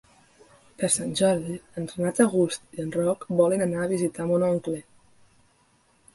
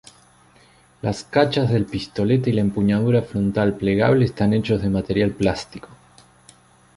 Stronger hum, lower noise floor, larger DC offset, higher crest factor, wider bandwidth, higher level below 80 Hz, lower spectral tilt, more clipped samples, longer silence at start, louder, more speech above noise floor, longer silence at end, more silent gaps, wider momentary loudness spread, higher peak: neither; first, -63 dBFS vs -53 dBFS; neither; about the same, 20 dB vs 18 dB; about the same, 12 kHz vs 11.5 kHz; second, -62 dBFS vs -44 dBFS; second, -5 dB/octave vs -7.5 dB/octave; neither; second, 0.8 s vs 1.05 s; second, -25 LUFS vs -20 LUFS; first, 39 dB vs 34 dB; first, 1.35 s vs 1 s; neither; first, 12 LU vs 9 LU; second, -6 dBFS vs -2 dBFS